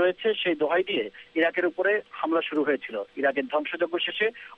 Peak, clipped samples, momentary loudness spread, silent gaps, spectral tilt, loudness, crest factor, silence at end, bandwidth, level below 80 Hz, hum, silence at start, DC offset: -12 dBFS; under 0.1%; 4 LU; none; -6 dB/octave; -26 LUFS; 16 dB; 0.05 s; 5.6 kHz; -74 dBFS; none; 0 s; under 0.1%